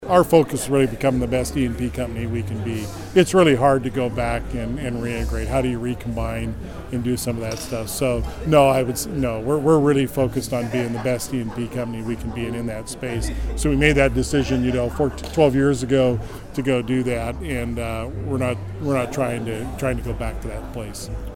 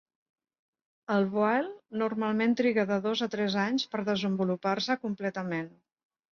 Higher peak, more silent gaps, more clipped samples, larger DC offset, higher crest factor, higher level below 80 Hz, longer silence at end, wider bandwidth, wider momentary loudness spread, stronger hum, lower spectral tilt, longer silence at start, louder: first, 0 dBFS vs -14 dBFS; neither; neither; neither; about the same, 20 dB vs 16 dB; first, -34 dBFS vs -72 dBFS; second, 0 s vs 0.65 s; first, 17 kHz vs 7 kHz; first, 12 LU vs 8 LU; neither; about the same, -6 dB/octave vs -6 dB/octave; second, 0 s vs 1.1 s; first, -22 LUFS vs -29 LUFS